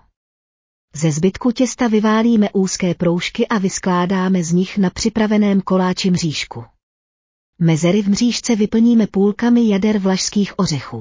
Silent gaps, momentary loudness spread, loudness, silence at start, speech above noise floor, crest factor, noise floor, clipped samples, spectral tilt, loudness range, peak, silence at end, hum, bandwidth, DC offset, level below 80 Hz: 6.83-7.53 s; 6 LU; -16 LUFS; 0.95 s; over 74 dB; 12 dB; under -90 dBFS; under 0.1%; -5.5 dB/octave; 3 LU; -4 dBFS; 0 s; none; 7.6 kHz; under 0.1%; -48 dBFS